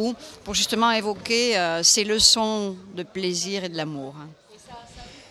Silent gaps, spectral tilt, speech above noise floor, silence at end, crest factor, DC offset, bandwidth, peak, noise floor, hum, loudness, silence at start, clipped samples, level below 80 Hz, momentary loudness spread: none; -1.5 dB/octave; 21 dB; 0.1 s; 22 dB; under 0.1%; 16 kHz; -2 dBFS; -45 dBFS; none; -21 LUFS; 0 s; under 0.1%; -52 dBFS; 19 LU